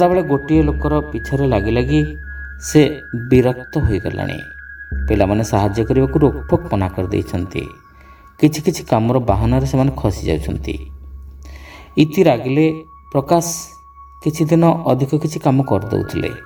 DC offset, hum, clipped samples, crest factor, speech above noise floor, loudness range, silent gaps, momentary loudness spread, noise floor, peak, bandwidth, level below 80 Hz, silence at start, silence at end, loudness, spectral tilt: under 0.1%; none; under 0.1%; 16 dB; 27 dB; 2 LU; none; 15 LU; -43 dBFS; 0 dBFS; 19.5 kHz; -30 dBFS; 0 s; 0 s; -17 LUFS; -7 dB/octave